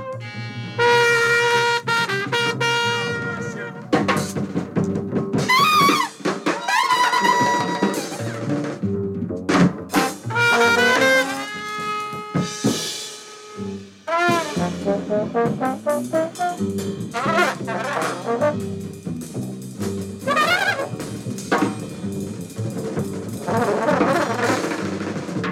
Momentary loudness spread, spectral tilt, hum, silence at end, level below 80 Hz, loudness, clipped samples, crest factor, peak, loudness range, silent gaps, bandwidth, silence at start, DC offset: 14 LU; -4.5 dB/octave; none; 0 s; -58 dBFS; -21 LUFS; under 0.1%; 16 dB; -4 dBFS; 5 LU; none; 17 kHz; 0 s; under 0.1%